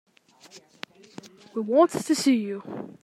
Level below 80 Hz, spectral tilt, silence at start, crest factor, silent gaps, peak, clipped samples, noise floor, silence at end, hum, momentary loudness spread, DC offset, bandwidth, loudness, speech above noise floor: -78 dBFS; -4.5 dB/octave; 0.55 s; 20 dB; none; -6 dBFS; under 0.1%; -53 dBFS; 0.1 s; none; 25 LU; under 0.1%; 14.5 kHz; -24 LUFS; 29 dB